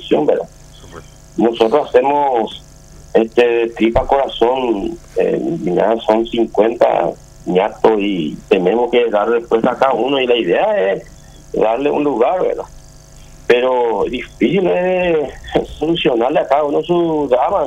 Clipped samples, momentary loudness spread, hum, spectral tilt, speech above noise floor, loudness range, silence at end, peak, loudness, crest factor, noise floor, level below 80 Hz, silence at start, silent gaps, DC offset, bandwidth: under 0.1%; 7 LU; none; -6.5 dB/octave; 25 dB; 2 LU; 0 s; 0 dBFS; -15 LUFS; 14 dB; -39 dBFS; -40 dBFS; 0 s; none; under 0.1%; 9.6 kHz